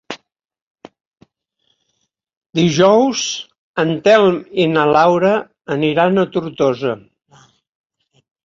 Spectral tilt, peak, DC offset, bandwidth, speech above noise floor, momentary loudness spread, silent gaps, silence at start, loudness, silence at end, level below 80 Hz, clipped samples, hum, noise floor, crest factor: -5 dB/octave; 0 dBFS; under 0.1%; 7.6 kHz; 56 dB; 13 LU; 0.62-0.75 s, 1.07-1.12 s, 2.37-2.41 s, 3.58-3.74 s; 0.1 s; -15 LUFS; 1.5 s; -58 dBFS; under 0.1%; none; -70 dBFS; 16 dB